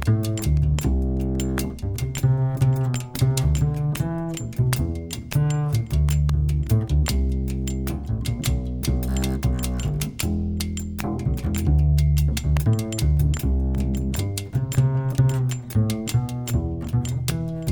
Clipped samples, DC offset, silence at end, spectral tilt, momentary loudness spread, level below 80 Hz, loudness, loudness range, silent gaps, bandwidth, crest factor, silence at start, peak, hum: under 0.1%; under 0.1%; 0 s; -6.5 dB/octave; 6 LU; -26 dBFS; -23 LUFS; 3 LU; none; over 20 kHz; 16 dB; 0 s; -6 dBFS; none